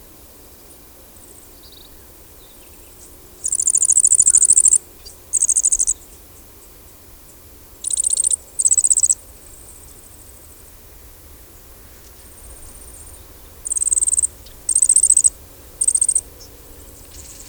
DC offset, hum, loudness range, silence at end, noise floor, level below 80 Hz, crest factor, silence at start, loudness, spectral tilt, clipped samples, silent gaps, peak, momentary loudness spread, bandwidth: under 0.1%; none; 9 LU; 0.05 s; -43 dBFS; -46 dBFS; 20 dB; 3.45 s; -14 LUFS; 0.5 dB/octave; under 0.1%; none; 0 dBFS; 17 LU; over 20 kHz